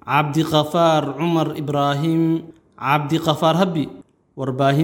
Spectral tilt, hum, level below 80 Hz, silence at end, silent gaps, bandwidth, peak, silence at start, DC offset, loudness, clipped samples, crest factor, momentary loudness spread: -6.5 dB/octave; none; -60 dBFS; 0 s; none; 17 kHz; -2 dBFS; 0.05 s; under 0.1%; -19 LUFS; under 0.1%; 18 dB; 9 LU